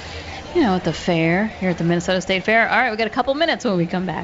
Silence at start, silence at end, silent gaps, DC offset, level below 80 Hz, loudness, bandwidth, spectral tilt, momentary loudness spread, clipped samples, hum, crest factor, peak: 0 s; 0 s; none; under 0.1%; -44 dBFS; -19 LUFS; 8 kHz; -5.5 dB/octave; 6 LU; under 0.1%; none; 14 dB; -6 dBFS